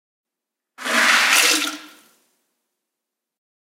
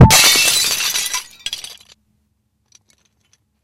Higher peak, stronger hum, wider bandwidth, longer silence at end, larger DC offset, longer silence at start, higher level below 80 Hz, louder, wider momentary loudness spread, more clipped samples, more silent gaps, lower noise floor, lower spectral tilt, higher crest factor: about the same, 0 dBFS vs 0 dBFS; neither; about the same, 16.5 kHz vs 17.5 kHz; second, 1.75 s vs 1.9 s; neither; first, 0.8 s vs 0 s; second, under -90 dBFS vs -30 dBFS; about the same, -15 LUFS vs -13 LUFS; about the same, 17 LU vs 19 LU; second, under 0.1% vs 0.5%; neither; first, -84 dBFS vs -66 dBFS; second, 2 dB/octave vs -2.5 dB/octave; first, 22 dB vs 16 dB